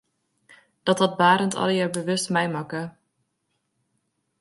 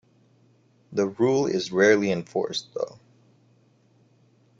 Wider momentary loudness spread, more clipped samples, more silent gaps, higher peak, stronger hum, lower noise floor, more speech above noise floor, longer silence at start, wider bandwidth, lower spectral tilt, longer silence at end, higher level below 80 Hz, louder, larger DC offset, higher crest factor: about the same, 13 LU vs 14 LU; neither; neither; about the same, -4 dBFS vs -6 dBFS; neither; first, -75 dBFS vs -61 dBFS; first, 53 dB vs 38 dB; about the same, 0.85 s vs 0.9 s; first, 12 kHz vs 7.8 kHz; about the same, -4.5 dB/octave vs -5 dB/octave; second, 1.5 s vs 1.7 s; about the same, -70 dBFS vs -68 dBFS; about the same, -23 LUFS vs -24 LUFS; neither; about the same, 20 dB vs 20 dB